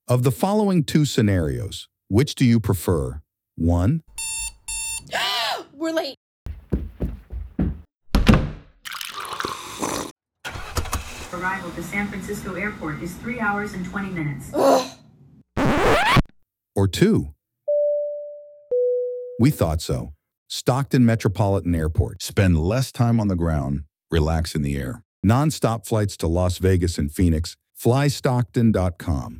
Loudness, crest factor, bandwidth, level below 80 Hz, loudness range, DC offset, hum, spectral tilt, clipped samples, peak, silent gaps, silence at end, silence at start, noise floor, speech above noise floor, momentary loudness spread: -22 LUFS; 22 dB; over 20 kHz; -36 dBFS; 6 LU; under 0.1%; none; -6 dB/octave; under 0.1%; 0 dBFS; 6.17-6.46 s, 10.11-10.16 s, 20.37-20.46 s, 25.05-25.23 s; 0 s; 0.1 s; -60 dBFS; 39 dB; 14 LU